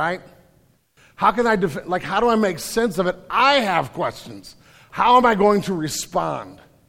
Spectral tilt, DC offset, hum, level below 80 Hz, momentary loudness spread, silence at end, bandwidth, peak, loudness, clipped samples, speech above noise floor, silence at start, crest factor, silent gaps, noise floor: -4.5 dB/octave; under 0.1%; none; -50 dBFS; 14 LU; 0.35 s; 16.5 kHz; -2 dBFS; -19 LUFS; under 0.1%; 39 dB; 0 s; 18 dB; none; -58 dBFS